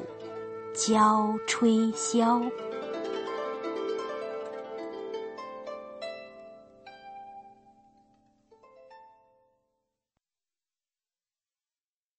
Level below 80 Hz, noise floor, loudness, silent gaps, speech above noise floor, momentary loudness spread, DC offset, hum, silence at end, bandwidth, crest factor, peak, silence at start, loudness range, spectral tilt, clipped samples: -74 dBFS; under -90 dBFS; -29 LUFS; none; over 65 dB; 23 LU; under 0.1%; none; 3.1 s; 8.8 kHz; 22 dB; -10 dBFS; 0 s; 24 LU; -4 dB/octave; under 0.1%